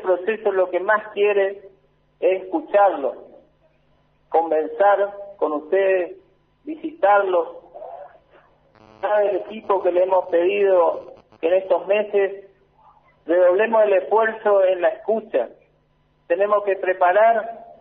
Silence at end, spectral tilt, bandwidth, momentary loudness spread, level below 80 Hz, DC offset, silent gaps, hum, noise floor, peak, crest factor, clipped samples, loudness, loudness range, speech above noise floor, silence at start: 0.15 s; -2 dB/octave; 3.9 kHz; 15 LU; -68 dBFS; under 0.1%; none; none; -62 dBFS; -6 dBFS; 16 dB; under 0.1%; -20 LUFS; 4 LU; 43 dB; 0 s